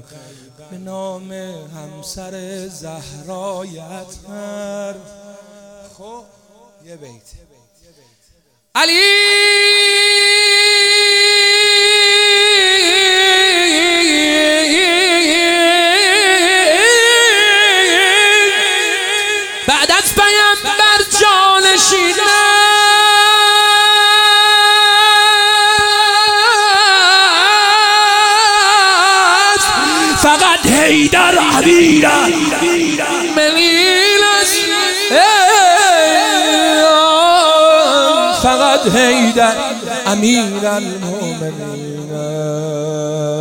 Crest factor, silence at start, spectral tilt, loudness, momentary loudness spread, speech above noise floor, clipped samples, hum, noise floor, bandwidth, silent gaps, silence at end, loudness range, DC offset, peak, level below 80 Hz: 12 dB; 0.7 s; -1.5 dB/octave; -9 LUFS; 14 LU; 40 dB; under 0.1%; none; -56 dBFS; over 20 kHz; none; 0 s; 10 LU; under 0.1%; 0 dBFS; -46 dBFS